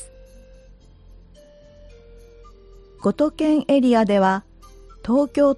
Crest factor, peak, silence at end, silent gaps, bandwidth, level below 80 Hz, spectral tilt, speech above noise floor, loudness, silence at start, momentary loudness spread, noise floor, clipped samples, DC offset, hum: 16 dB; -6 dBFS; 0 s; none; 11.5 kHz; -48 dBFS; -6.5 dB/octave; 30 dB; -19 LUFS; 0 s; 10 LU; -48 dBFS; under 0.1%; under 0.1%; none